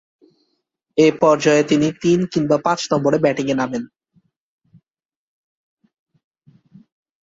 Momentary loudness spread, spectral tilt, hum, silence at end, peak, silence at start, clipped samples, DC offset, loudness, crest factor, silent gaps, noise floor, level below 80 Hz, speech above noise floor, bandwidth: 10 LU; -5.5 dB/octave; none; 3.35 s; -2 dBFS; 0.95 s; under 0.1%; under 0.1%; -17 LUFS; 18 dB; none; -89 dBFS; -60 dBFS; 73 dB; 7.8 kHz